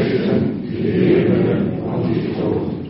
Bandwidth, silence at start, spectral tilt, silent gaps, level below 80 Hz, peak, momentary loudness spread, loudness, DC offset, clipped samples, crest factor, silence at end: 5.8 kHz; 0 s; -7.5 dB/octave; none; -46 dBFS; -4 dBFS; 7 LU; -18 LUFS; under 0.1%; under 0.1%; 14 dB; 0 s